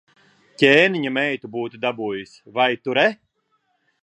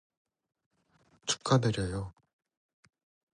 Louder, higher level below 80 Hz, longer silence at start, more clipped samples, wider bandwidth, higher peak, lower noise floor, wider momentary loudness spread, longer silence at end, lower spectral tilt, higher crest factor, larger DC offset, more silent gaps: first, -20 LUFS vs -31 LUFS; second, -66 dBFS vs -56 dBFS; second, 0.6 s vs 1.25 s; neither; about the same, 10.5 kHz vs 10.5 kHz; first, 0 dBFS vs -14 dBFS; about the same, -69 dBFS vs -69 dBFS; about the same, 15 LU vs 13 LU; second, 0.9 s vs 1.25 s; about the same, -5 dB/octave vs -5 dB/octave; about the same, 22 dB vs 22 dB; neither; neither